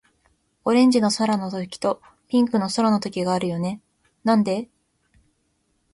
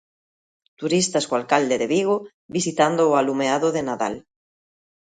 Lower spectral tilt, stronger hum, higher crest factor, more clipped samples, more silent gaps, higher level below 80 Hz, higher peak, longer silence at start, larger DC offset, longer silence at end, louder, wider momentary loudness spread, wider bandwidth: first, -5.5 dB/octave vs -4 dB/octave; neither; second, 16 dB vs 22 dB; neither; second, none vs 2.34-2.49 s; about the same, -62 dBFS vs -64 dBFS; second, -8 dBFS vs -2 dBFS; second, 0.65 s vs 0.8 s; neither; first, 1.3 s vs 0.9 s; about the same, -22 LUFS vs -21 LUFS; first, 12 LU vs 9 LU; first, 11.5 kHz vs 9.6 kHz